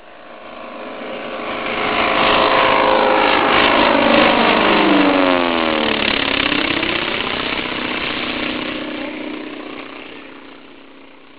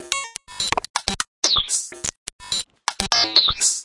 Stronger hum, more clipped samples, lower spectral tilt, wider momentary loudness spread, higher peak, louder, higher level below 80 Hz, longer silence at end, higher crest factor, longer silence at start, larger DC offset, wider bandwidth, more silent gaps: neither; neither; first, -7.5 dB/octave vs 0.5 dB/octave; first, 18 LU vs 13 LU; about the same, 0 dBFS vs 0 dBFS; first, -15 LUFS vs -20 LUFS; about the same, -44 dBFS vs -46 dBFS; first, 0.35 s vs 0 s; second, 18 dB vs 24 dB; about the same, 0.05 s vs 0 s; first, 0.6% vs under 0.1%; second, 4 kHz vs 12 kHz; second, none vs 0.90-0.94 s, 1.28-1.42 s, 2.17-2.26 s, 2.33-2.39 s